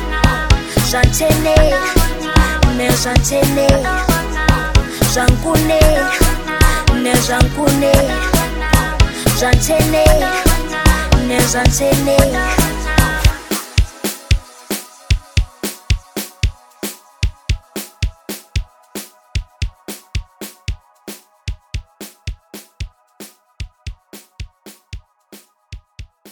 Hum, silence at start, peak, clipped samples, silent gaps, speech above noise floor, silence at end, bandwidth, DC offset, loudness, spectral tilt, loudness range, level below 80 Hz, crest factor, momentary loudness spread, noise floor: none; 0 s; 0 dBFS; under 0.1%; none; 33 dB; 0.25 s; 19.5 kHz; under 0.1%; -15 LUFS; -4.5 dB/octave; 18 LU; -20 dBFS; 16 dB; 19 LU; -45 dBFS